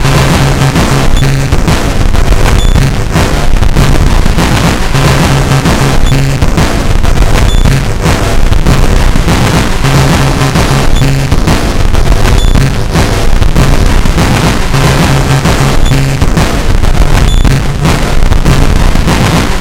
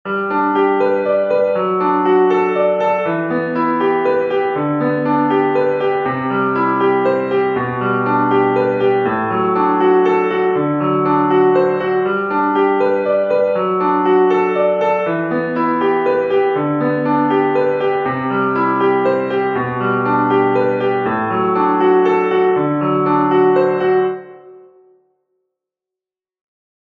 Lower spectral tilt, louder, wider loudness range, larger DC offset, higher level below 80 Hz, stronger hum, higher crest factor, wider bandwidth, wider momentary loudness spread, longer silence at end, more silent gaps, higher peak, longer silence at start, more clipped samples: second, -5 dB/octave vs -9 dB/octave; first, -9 LUFS vs -15 LUFS; about the same, 1 LU vs 2 LU; neither; first, -8 dBFS vs -58 dBFS; neither; second, 6 dB vs 14 dB; first, 16.5 kHz vs 4.9 kHz; about the same, 3 LU vs 5 LU; second, 0 s vs 2.3 s; neither; about the same, 0 dBFS vs -2 dBFS; about the same, 0 s vs 0.05 s; first, 0.7% vs under 0.1%